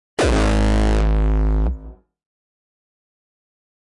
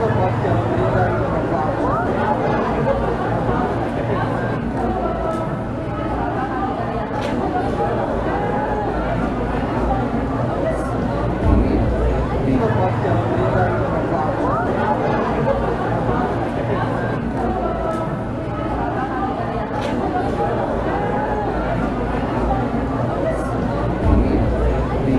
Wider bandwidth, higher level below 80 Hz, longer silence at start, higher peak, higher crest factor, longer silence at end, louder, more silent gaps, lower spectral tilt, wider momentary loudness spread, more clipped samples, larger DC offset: about the same, 11 kHz vs 11.5 kHz; first, -22 dBFS vs -28 dBFS; first, 0.2 s vs 0 s; second, -12 dBFS vs -2 dBFS; second, 8 dB vs 18 dB; first, 2.05 s vs 0 s; about the same, -19 LUFS vs -20 LUFS; neither; second, -6 dB/octave vs -8.5 dB/octave; about the same, 6 LU vs 4 LU; neither; neither